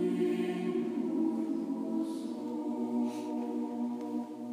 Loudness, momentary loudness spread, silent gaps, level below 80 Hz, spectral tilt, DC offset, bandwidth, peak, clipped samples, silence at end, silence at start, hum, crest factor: -34 LUFS; 6 LU; none; under -90 dBFS; -7 dB/octave; under 0.1%; 15 kHz; -20 dBFS; under 0.1%; 0 s; 0 s; none; 14 dB